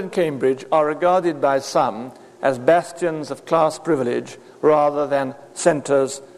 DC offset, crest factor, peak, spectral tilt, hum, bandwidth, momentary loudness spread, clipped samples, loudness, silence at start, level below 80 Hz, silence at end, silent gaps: under 0.1%; 18 dB; -2 dBFS; -5 dB/octave; none; 13 kHz; 8 LU; under 0.1%; -20 LUFS; 0 s; -66 dBFS; 0.1 s; none